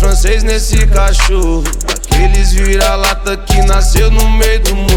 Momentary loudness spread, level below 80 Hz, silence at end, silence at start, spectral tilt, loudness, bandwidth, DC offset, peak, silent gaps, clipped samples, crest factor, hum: 4 LU; -10 dBFS; 0 s; 0 s; -4 dB/octave; -12 LUFS; 16.5 kHz; under 0.1%; 0 dBFS; none; under 0.1%; 8 dB; none